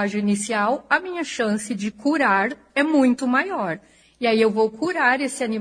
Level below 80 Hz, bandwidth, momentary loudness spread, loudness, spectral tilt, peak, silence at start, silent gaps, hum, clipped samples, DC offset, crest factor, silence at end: -64 dBFS; 10.5 kHz; 7 LU; -21 LUFS; -4.5 dB/octave; -6 dBFS; 0 s; none; none; under 0.1%; under 0.1%; 16 dB; 0 s